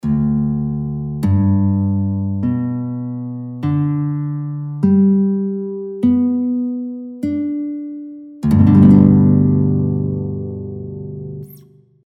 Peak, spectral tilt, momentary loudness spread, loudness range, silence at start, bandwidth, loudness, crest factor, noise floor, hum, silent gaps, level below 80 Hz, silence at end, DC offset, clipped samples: 0 dBFS; -11.5 dB/octave; 17 LU; 6 LU; 0.05 s; 4.7 kHz; -16 LUFS; 16 dB; -46 dBFS; none; none; -40 dBFS; 0.5 s; under 0.1%; under 0.1%